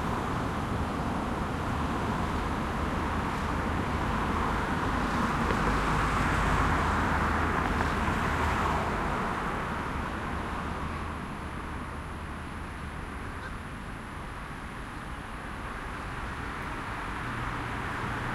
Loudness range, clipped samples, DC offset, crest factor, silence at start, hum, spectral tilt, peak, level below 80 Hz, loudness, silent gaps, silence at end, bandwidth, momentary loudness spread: 11 LU; under 0.1%; under 0.1%; 20 dB; 0 s; none; -6 dB/octave; -10 dBFS; -38 dBFS; -31 LUFS; none; 0 s; 15.5 kHz; 11 LU